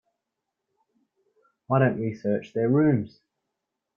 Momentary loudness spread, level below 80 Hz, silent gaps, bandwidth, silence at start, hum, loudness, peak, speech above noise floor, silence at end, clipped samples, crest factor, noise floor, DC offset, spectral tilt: 7 LU; -66 dBFS; none; 6.8 kHz; 1.7 s; none; -24 LUFS; -6 dBFS; 60 dB; 0.9 s; under 0.1%; 20 dB; -84 dBFS; under 0.1%; -10 dB/octave